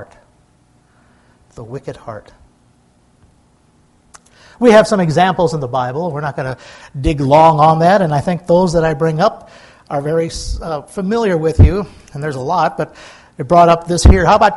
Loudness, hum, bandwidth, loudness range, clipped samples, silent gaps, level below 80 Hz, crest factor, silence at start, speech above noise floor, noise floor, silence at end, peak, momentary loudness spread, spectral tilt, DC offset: -13 LUFS; none; 12 kHz; 22 LU; 0.1%; none; -24 dBFS; 14 dB; 0 s; 40 dB; -53 dBFS; 0 s; 0 dBFS; 19 LU; -6.5 dB/octave; under 0.1%